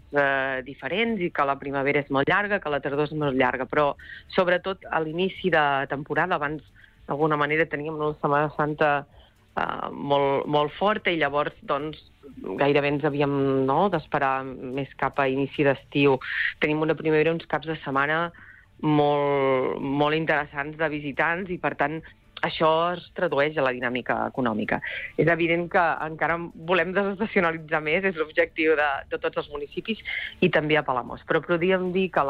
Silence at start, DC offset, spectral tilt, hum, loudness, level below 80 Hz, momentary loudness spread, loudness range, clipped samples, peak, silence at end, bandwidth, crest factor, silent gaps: 0.1 s; under 0.1%; -8 dB/octave; none; -25 LUFS; -54 dBFS; 8 LU; 1 LU; under 0.1%; -10 dBFS; 0 s; 6.6 kHz; 16 dB; none